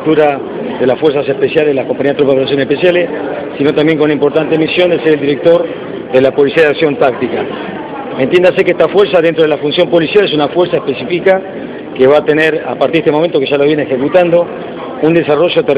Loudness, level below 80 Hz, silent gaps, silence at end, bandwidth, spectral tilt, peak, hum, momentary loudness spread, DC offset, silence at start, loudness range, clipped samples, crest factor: -11 LUFS; -50 dBFS; none; 0 s; 7.8 kHz; -7.5 dB/octave; 0 dBFS; none; 10 LU; under 0.1%; 0 s; 1 LU; 0.2%; 10 dB